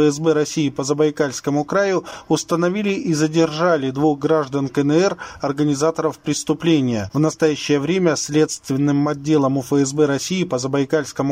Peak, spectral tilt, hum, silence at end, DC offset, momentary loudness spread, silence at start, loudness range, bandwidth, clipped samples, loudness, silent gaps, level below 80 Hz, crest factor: -4 dBFS; -5.5 dB/octave; none; 0 s; under 0.1%; 4 LU; 0 s; 1 LU; 16 kHz; under 0.1%; -19 LUFS; none; -56 dBFS; 14 dB